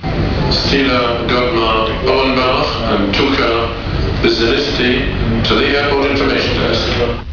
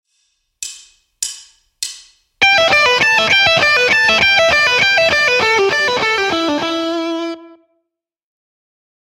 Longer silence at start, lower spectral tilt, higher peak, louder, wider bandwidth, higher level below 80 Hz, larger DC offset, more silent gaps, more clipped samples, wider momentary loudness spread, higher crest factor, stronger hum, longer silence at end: second, 0 s vs 0.6 s; first, -6 dB/octave vs -1.5 dB/octave; about the same, 0 dBFS vs 0 dBFS; second, -14 LUFS vs -11 LUFS; second, 5.4 kHz vs 16.5 kHz; first, -24 dBFS vs -48 dBFS; first, 0.7% vs under 0.1%; neither; neither; second, 4 LU vs 16 LU; about the same, 14 dB vs 16 dB; neither; second, 0 s vs 1.55 s